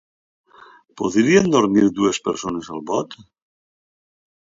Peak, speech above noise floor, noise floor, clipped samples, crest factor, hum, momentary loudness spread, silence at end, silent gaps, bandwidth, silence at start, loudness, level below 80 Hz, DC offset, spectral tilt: -2 dBFS; 30 dB; -48 dBFS; under 0.1%; 20 dB; none; 12 LU; 1.35 s; none; 7.8 kHz; 0.95 s; -19 LUFS; -56 dBFS; under 0.1%; -5 dB/octave